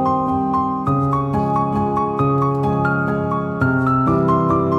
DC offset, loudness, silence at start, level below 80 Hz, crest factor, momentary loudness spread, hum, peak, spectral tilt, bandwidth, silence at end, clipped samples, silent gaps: under 0.1%; -18 LUFS; 0 s; -42 dBFS; 12 dB; 3 LU; none; -6 dBFS; -10 dB/octave; 7 kHz; 0 s; under 0.1%; none